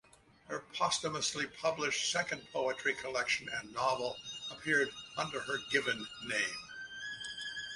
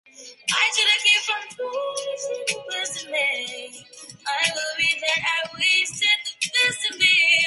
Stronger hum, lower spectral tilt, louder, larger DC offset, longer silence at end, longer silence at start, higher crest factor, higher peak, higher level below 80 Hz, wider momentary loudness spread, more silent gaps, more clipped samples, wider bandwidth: neither; first, -1.5 dB/octave vs 1 dB/octave; second, -35 LUFS vs -20 LUFS; neither; about the same, 0 s vs 0 s; first, 0.45 s vs 0.2 s; about the same, 20 dB vs 18 dB; second, -16 dBFS vs -6 dBFS; about the same, -72 dBFS vs -70 dBFS; second, 10 LU vs 13 LU; neither; neither; about the same, 11.5 kHz vs 12 kHz